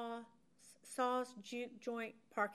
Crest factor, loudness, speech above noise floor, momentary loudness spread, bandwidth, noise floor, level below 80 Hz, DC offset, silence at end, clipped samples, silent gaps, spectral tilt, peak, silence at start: 20 dB; -43 LUFS; 23 dB; 22 LU; 14 kHz; -67 dBFS; under -90 dBFS; under 0.1%; 0 s; under 0.1%; none; -3.5 dB/octave; -24 dBFS; 0 s